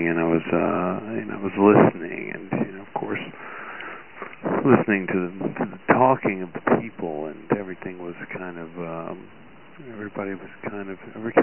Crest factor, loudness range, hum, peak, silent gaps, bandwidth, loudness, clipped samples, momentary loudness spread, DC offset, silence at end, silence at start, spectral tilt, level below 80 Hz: 24 dB; 10 LU; none; 0 dBFS; none; 3.2 kHz; -24 LUFS; under 0.1%; 17 LU; 0.4%; 0 s; 0 s; -11 dB/octave; -60 dBFS